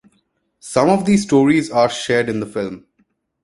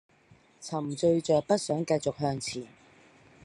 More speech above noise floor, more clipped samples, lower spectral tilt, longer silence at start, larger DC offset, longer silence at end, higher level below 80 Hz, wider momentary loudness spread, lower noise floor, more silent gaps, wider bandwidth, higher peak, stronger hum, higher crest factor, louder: first, 48 dB vs 32 dB; neither; about the same, -5.5 dB/octave vs -5.5 dB/octave; about the same, 0.65 s vs 0.6 s; neither; about the same, 0.65 s vs 0.75 s; first, -54 dBFS vs -68 dBFS; about the same, 12 LU vs 14 LU; first, -65 dBFS vs -61 dBFS; neither; about the same, 11.5 kHz vs 11.5 kHz; first, 0 dBFS vs -12 dBFS; neither; about the same, 18 dB vs 18 dB; first, -17 LUFS vs -29 LUFS